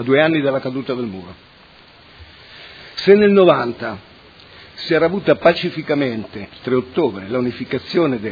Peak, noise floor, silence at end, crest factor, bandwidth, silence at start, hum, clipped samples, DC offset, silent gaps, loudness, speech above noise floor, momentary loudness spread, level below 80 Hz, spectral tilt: 0 dBFS; -46 dBFS; 0 s; 18 dB; 5 kHz; 0 s; none; under 0.1%; under 0.1%; none; -17 LUFS; 29 dB; 19 LU; -54 dBFS; -7.5 dB/octave